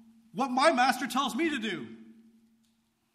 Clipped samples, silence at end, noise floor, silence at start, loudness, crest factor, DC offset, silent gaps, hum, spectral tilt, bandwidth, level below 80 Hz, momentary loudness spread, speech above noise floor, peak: under 0.1%; 1.05 s; -72 dBFS; 0.35 s; -28 LUFS; 20 dB; under 0.1%; none; none; -3 dB/octave; 15 kHz; -74 dBFS; 16 LU; 44 dB; -10 dBFS